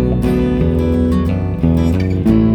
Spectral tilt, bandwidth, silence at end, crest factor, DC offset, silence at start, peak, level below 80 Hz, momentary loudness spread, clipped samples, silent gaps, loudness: -9.5 dB/octave; 13.5 kHz; 0 s; 12 dB; under 0.1%; 0 s; 0 dBFS; -22 dBFS; 2 LU; under 0.1%; none; -15 LUFS